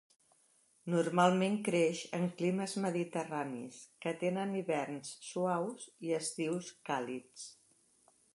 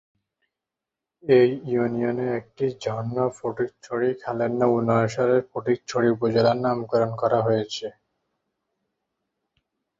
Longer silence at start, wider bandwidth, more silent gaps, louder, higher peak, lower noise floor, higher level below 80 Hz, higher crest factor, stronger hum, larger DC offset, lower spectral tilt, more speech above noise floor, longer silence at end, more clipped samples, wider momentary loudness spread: second, 0.85 s vs 1.25 s; first, 11.5 kHz vs 8 kHz; neither; second, -35 LUFS vs -23 LUFS; second, -14 dBFS vs -6 dBFS; second, -71 dBFS vs -87 dBFS; second, -84 dBFS vs -62 dBFS; about the same, 22 dB vs 18 dB; neither; neither; second, -5.5 dB/octave vs -7 dB/octave; second, 36 dB vs 64 dB; second, 0.8 s vs 2.1 s; neither; first, 14 LU vs 8 LU